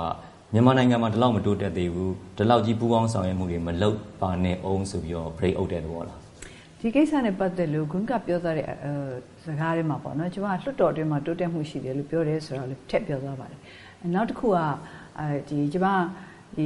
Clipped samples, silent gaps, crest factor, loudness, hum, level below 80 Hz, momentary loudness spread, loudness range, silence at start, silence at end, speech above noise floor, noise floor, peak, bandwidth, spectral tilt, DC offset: under 0.1%; none; 22 dB; -26 LUFS; none; -50 dBFS; 14 LU; 5 LU; 0 s; 0 s; 20 dB; -45 dBFS; -4 dBFS; 11.5 kHz; -7.5 dB/octave; under 0.1%